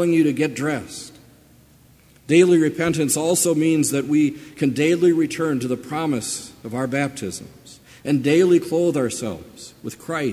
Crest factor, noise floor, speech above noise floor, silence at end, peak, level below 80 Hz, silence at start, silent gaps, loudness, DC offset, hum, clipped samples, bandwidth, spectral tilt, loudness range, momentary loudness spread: 18 dB; -52 dBFS; 32 dB; 0 s; -2 dBFS; -56 dBFS; 0 s; none; -20 LUFS; under 0.1%; none; under 0.1%; 16 kHz; -5 dB/octave; 4 LU; 17 LU